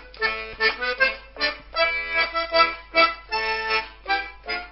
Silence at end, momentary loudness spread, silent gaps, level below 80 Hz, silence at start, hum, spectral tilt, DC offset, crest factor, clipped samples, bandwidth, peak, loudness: 0 s; 7 LU; none; -48 dBFS; 0 s; none; -5.5 dB/octave; under 0.1%; 20 dB; under 0.1%; 5.8 kHz; -4 dBFS; -22 LUFS